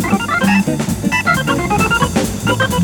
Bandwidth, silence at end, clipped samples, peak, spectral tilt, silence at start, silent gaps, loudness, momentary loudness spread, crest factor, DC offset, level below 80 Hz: 19 kHz; 0 s; under 0.1%; 0 dBFS; -5 dB/octave; 0 s; none; -15 LUFS; 4 LU; 14 dB; under 0.1%; -34 dBFS